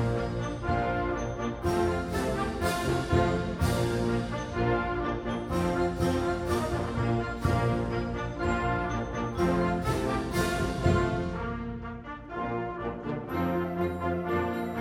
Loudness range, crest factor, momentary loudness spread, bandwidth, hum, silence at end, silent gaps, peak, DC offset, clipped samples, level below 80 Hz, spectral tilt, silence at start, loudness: 3 LU; 18 dB; 6 LU; 16.5 kHz; none; 0 s; none; -12 dBFS; under 0.1%; under 0.1%; -40 dBFS; -6.5 dB/octave; 0 s; -30 LUFS